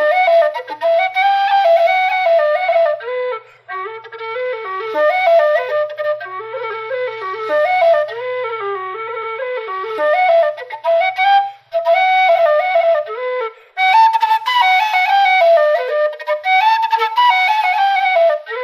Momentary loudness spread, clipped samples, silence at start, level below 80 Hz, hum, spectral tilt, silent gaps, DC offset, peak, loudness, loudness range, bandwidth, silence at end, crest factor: 12 LU; under 0.1%; 0 s; -80 dBFS; none; -1.5 dB/octave; none; under 0.1%; -2 dBFS; -15 LUFS; 5 LU; 15.5 kHz; 0 s; 12 dB